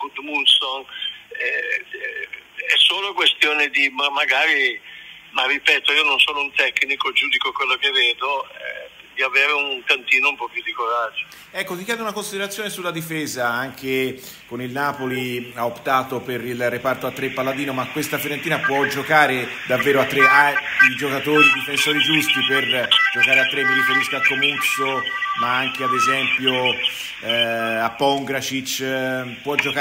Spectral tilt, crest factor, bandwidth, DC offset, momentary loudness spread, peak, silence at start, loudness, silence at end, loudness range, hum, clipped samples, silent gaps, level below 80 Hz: -2.5 dB/octave; 20 dB; 16 kHz; under 0.1%; 12 LU; 0 dBFS; 0 s; -18 LUFS; 0 s; 9 LU; none; under 0.1%; none; -64 dBFS